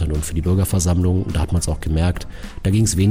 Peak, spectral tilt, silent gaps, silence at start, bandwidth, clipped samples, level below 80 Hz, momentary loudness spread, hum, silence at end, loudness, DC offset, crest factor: -6 dBFS; -6 dB/octave; none; 0 s; 16.5 kHz; under 0.1%; -26 dBFS; 6 LU; none; 0 s; -20 LUFS; under 0.1%; 12 dB